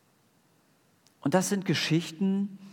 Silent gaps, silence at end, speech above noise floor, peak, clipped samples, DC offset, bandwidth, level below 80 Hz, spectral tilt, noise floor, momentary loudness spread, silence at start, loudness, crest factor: none; 0 s; 38 dB; -10 dBFS; under 0.1%; under 0.1%; 18 kHz; -82 dBFS; -5 dB/octave; -66 dBFS; 5 LU; 1.25 s; -28 LUFS; 22 dB